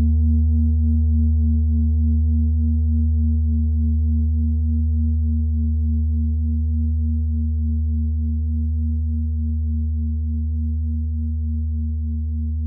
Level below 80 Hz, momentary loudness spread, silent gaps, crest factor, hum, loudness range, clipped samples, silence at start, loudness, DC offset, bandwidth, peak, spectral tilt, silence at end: -22 dBFS; 6 LU; none; 8 dB; none; 4 LU; under 0.1%; 0 s; -21 LUFS; under 0.1%; 0.7 kHz; -10 dBFS; -18 dB/octave; 0 s